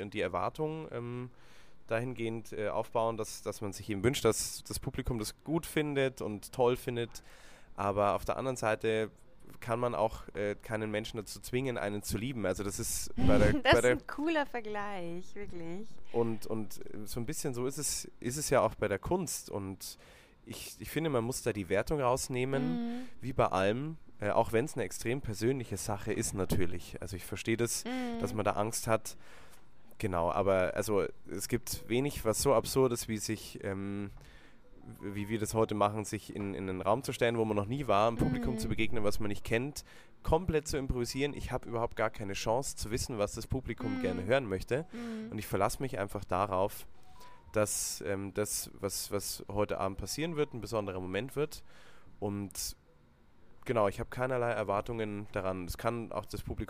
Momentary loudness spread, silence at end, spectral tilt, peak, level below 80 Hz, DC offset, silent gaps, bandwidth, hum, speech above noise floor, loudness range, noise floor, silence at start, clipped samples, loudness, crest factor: 11 LU; 0 s; -4.5 dB/octave; -10 dBFS; -50 dBFS; under 0.1%; none; 15.5 kHz; none; 28 dB; 5 LU; -61 dBFS; 0 s; under 0.1%; -34 LUFS; 24 dB